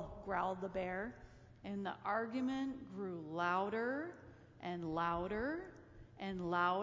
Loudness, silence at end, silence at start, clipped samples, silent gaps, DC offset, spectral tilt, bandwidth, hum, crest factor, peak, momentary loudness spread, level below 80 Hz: -41 LUFS; 0 s; 0 s; under 0.1%; none; under 0.1%; -7 dB/octave; 7.6 kHz; none; 20 dB; -22 dBFS; 18 LU; -64 dBFS